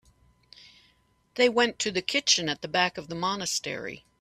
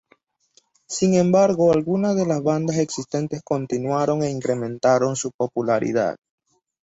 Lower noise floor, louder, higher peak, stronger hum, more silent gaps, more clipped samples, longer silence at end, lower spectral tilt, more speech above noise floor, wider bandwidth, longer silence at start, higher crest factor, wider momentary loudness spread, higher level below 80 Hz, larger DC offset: first, -66 dBFS vs -61 dBFS; second, -26 LUFS vs -21 LUFS; about the same, -6 dBFS vs -6 dBFS; neither; second, none vs 5.34-5.39 s; neither; second, 0.25 s vs 0.7 s; second, -2 dB/octave vs -6 dB/octave; about the same, 39 dB vs 41 dB; first, 14.5 kHz vs 8 kHz; first, 1.35 s vs 0.9 s; first, 22 dB vs 16 dB; first, 12 LU vs 9 LU; second, -66 dBFS vs -60 dBFS; neither